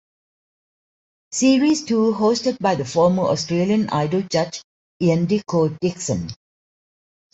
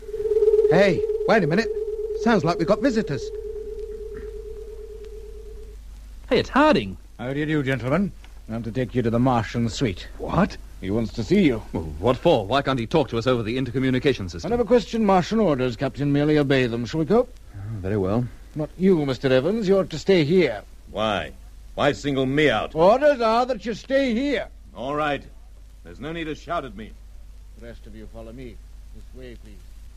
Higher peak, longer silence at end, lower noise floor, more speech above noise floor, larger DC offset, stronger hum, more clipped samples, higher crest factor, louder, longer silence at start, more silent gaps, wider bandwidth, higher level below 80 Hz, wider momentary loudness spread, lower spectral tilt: about the same, -6 dBFS vs -6 dBFS; first, 1 s vs 0.05 s; first, under -90 dBFS vs -43 dBFS; first, over 71 dB vs 22 dB; neither; neither; neither; about the same, 16 dB vs 18 dB; about the same, -20 LUFS vs -22 LUFS; first, 1.3 s vs 0 s; first, 4.64-5.00 s vs none; second, 8.2 kHz vs 13.5 kHz; second, -58 dBFS vs -40 dBFS; second, 8 LU vs 20 LU; about the same, -5.5 dB/octave vs -6.5 dB/octave